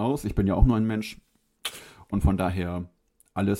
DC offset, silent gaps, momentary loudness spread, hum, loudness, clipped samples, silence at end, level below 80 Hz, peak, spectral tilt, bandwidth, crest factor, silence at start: under 0.1%; none; 15 LU; none; -27 LUFS; under 0.1%; 0 s; -32 dBFS; -6 dBFS; -7 dB/octave; 16.5 kHz; 20 dB; 0 s